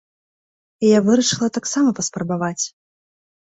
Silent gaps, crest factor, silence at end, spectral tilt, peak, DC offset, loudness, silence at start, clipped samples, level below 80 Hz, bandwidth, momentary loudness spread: none; 16 dB; 0.75 s; -4 dB/octave; -4 dBFS; under 0.1%; -19 LUFS; 0.8 s; under 0.1%; -60 dBFS; 8.4 kHz; 9 LU